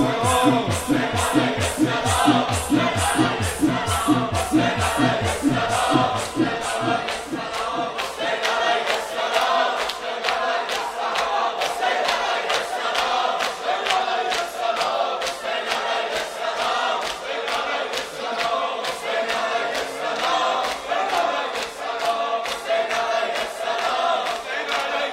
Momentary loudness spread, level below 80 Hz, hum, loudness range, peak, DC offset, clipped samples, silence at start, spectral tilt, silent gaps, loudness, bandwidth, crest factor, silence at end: 6 LU; -48 dBFS; none; 4 LU; -2 dBFS; under 0.1%; under 0.1%; 0 s; -3.5 dB/octave; none; -22 LUFS; 16 kHz; 20 dB; 0 s